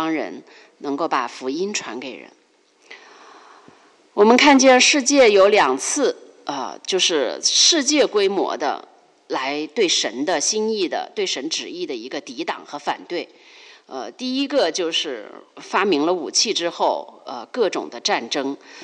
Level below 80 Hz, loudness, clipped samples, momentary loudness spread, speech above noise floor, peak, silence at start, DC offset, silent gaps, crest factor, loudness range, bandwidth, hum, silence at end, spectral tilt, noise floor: -66 dBFS; -19 LUFS; under 0.1%; 18 LU; 37 dB; -2 dBFS; 0 s; under 0.1%; none; 18 dB; 12 LU; 11 kHz; none; 0 s; -1.5 dB/octave; -57 dBFS